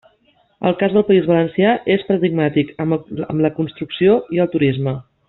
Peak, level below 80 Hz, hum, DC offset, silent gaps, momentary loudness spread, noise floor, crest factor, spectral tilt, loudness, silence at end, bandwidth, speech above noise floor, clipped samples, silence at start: -2 dBFS; -54 dBFS; none; under 0.1%; none; 8 LU; -58 dBFS; 16 dB; -6 dB/octave; -17 LUFS; 0.3 s; 4.2 kHz; 42 dB; under 0.1%; 0.6 s